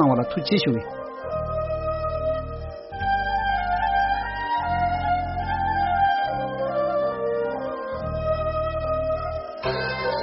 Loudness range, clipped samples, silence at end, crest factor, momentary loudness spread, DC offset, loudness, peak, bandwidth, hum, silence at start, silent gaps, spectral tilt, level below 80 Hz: 3 LU; under 0.1%; 0 s; 18 dB; 8 LU; under 0.1%; -25 LUFS; -8 dBFS; 5.8 kHz; none; 0 s; none; -4 dB/octave; -38 dBFS